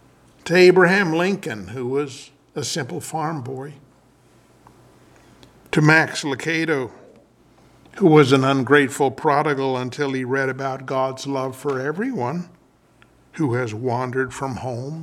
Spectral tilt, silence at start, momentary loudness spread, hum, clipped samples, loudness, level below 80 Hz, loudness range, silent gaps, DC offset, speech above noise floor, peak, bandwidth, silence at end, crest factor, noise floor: -5.5 dB/octave; 0.45 s; 16 LU; none; under 0.1%; -20 LUFS; -62 dBFS; 10 LU; none; under 0.1%; 35 dB; 0 dBFS; 14 kHz; 0 s; 22 dB; -55 dBFS